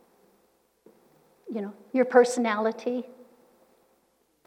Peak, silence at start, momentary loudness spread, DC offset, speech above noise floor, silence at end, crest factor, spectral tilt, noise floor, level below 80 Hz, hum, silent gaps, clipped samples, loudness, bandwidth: -6 dBFS; 1.45 s; 16 LU; under 0.1%; 44 dB; 1.35 s; 24 dB; -4.5 dB/octave; -69 dBFS; -86 dBFS; none; none; under 0.1%; -26 LUFS; 12.5 kHz